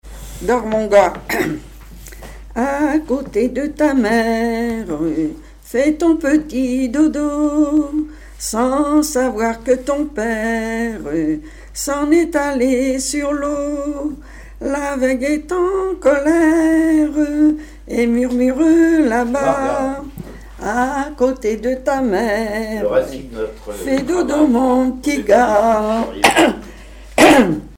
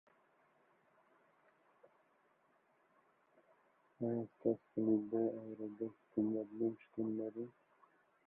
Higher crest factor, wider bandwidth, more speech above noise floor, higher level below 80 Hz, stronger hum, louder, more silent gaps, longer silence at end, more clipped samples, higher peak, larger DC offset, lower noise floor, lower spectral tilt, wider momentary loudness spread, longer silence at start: second, 16 dB vs 22 dB; first, 17 kHz vs 3 kHz; second, 20 dB vs 36 dB; first, -38 dBFS vs -84 dBFS; neither; first, -16 LUFS vs -41 LUFS; neither; second, 0 s vs 0.8 s; neither; first, 0 dBFS vs -22 dBFS; neither; second, -36 dBFS vs -75 dBFS; second, -4.5 dB/octave vs -8.5 dB/octave; about the same, 13 LU vs 11 LU; second, 0.05 s vs 4 s